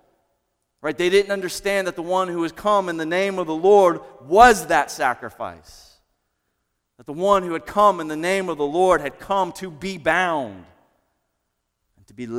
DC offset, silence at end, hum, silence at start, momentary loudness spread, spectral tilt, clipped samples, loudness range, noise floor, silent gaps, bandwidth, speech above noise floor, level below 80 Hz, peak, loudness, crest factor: under 0.1%; 0 s; none; 0.85 s; 16 LU; -4 dB/octave; under 0.1%; 6 LU; -75 dBFS; none; 16 kHz; 55 dB; -50 dBFS; 0 dBFS; -20 LUFS; 22 dB